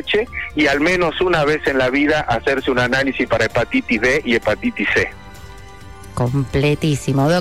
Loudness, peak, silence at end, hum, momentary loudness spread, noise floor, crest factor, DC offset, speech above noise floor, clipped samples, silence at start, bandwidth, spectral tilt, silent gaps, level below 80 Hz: -17 LUFS; -6 dBFS; 0 s; none; 5 LU; -37 dBFS; 12 dB; 0.8%; 20 dB; under 0.1%; 0 s; 14.5 kHz; -5.5 dB/octave; none; -38 dBFS